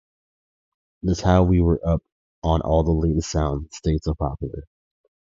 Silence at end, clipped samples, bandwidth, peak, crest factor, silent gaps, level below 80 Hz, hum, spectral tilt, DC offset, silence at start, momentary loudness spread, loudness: 0.65 s; under 0.1%; 7.6 kHz; -4 dBFS; 18 dB; 2.12-2.42 s; -30 dBFS; none; -7.5 dB/octave; under 0.1%; 1.05 s; 11 LU; -22 LUFS